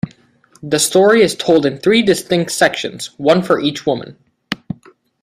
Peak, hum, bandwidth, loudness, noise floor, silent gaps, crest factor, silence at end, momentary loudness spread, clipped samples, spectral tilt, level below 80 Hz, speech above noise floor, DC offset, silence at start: 0 dBFS; none; 16 kHz; -14 LUFS; -52 dBFS; none; 16 dB; 0.65 s; 16 LU; under 0.1%; -4 dB/octave; -54 dBFS; 38 dB; under 0.1%; 0.05 s